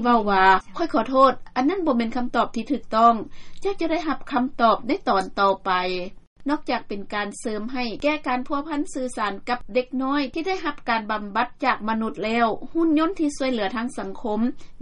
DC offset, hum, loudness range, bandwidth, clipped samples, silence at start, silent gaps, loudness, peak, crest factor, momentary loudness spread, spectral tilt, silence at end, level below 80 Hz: under 0.1%; none; 5 LU; 11.5 kHz; under 0.1%; 0 s; 6.27-6.36 s; -23 LUFS; -4 dBFS; 18 dB; 10 LU; -5 dB/octave; 0 s; -44 dBFS